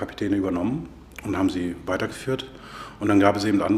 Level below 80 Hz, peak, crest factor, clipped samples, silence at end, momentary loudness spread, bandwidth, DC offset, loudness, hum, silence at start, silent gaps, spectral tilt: -50 dBFS; -2 dBFS; 22 dB; under 0.1%; 0 s; 18 LU; 13.5 kHz; under 0.1%; -24 LUFS; none; 0 s; none; -6.5 dB/octave